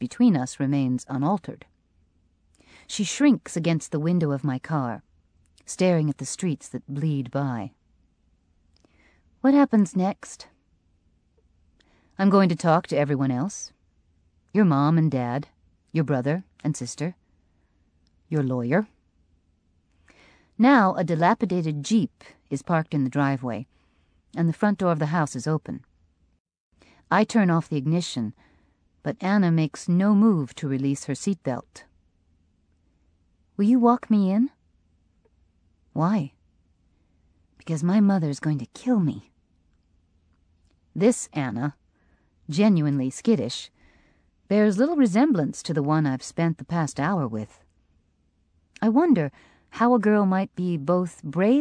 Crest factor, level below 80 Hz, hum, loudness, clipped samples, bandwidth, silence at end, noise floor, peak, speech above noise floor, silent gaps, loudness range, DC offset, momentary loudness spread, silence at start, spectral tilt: 18 dB; -64 dBFS; none; -24 LUFS; under 0.1%; 10.5 kHz; 0 s; -67 dBFS; -6 dBFS; 44 dB; 26.40-26.45 s, 26.60-26.71 s; 6 LU; under 0.1%; 14 LU; 0 s; -6.5 dB/octave